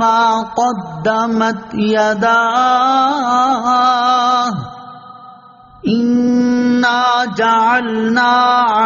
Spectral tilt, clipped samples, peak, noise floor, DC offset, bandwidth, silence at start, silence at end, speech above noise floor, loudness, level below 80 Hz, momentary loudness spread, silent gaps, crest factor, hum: -2.5 dB/octave; under 0.1%; -2 dBFS; -41 dBFS; under 0.1%; 7.4 kHz; 0 s; 0 s; 28 dB; -13 LUFS; -54 dBFS; 7 LU; none; 12 dB; none